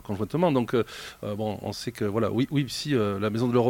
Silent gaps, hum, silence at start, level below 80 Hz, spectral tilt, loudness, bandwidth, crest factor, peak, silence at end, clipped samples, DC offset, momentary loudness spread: none; none; 0.05 s; -58 dBFS; -6.5 dB/octave; -27 LUFS; 17 kHz; 16 dB; -10 dBFS; 0 s; under 0.1%; under 0.1%; 9 LU